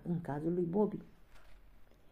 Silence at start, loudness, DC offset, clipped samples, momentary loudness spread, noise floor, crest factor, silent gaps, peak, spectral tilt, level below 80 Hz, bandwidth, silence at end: 0 s; -36 LUFS; under 0.1%; under 0.1%; 6 LU; -58 dBFS; 18 dB; none; -20 dBFS; -10.5 dB/octave; -62 dBFS; 10 kHz; 0.05 s